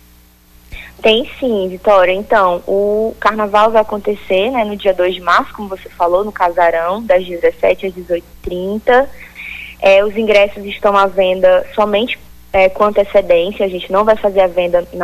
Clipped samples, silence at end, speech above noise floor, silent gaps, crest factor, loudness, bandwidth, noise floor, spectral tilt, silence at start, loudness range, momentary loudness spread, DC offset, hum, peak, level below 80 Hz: under 0.1%; 0 s; 32 dB; none; 12 dB; -13 LUFS; 14.5 kHz; -45 dBFS; -5 dB/octave; 0.7 s; 2 LU; 10 LU; under 0.1%; 60 Hz at -40 dBFS; -2 dBFS; -40 dBFS